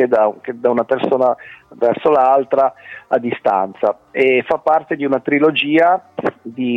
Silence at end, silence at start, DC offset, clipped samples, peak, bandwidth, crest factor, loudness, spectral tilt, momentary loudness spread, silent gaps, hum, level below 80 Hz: 0 s; 0 s; under 0.1%; under 0.1%; -4 dBFS; 6.2 kHz; 12 dB; -16 LUFS; -7 dB/octave; 7 LU; none; none; -62 dBFS